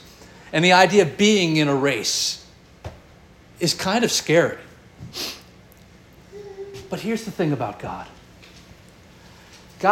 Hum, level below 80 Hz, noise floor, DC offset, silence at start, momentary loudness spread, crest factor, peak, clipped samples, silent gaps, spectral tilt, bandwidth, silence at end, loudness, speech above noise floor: none; -54 dBFS; -49 dBFS; under 0.1%; 0.5 s; 24 LU; 22 dB; -2 dBFS; under 0.1%; none; -4 dB/octave; 17 kHz; 0 s; -20 LUFS; 29 dB